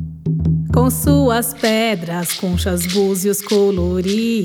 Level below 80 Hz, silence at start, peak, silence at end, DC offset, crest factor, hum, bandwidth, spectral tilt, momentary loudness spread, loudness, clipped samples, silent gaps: -32 dBFS; 0 s; 0 dBFS; 0 s; under 0.1%; 16 dB; none; 19.5 kHz; -5 dB/octave; 6 LU; -17 LUFS; under 0.1%; none